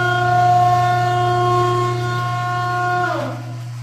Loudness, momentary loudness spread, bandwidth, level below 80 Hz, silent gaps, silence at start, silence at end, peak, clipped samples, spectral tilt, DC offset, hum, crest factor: -17 LUFS; 9 LU; 13.5 kHz; -50 dBFS; none; 0 s; 0 s; -6 dBFS; under 0.1%; -6 dB/octave; under 0.1%; none; 12 dB